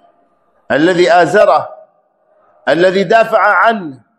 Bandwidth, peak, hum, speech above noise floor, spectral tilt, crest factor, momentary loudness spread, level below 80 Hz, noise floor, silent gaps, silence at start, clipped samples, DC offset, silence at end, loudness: 12.5 kHz; 0 dBFS; none; 46 dB; -5.5 dB/octave; 12 dB; 10 LU; -58 dBFS; -56 dBFS; none; 0.7 s; 0.2%; under 0.1%; 0.25 s; -11 LUFS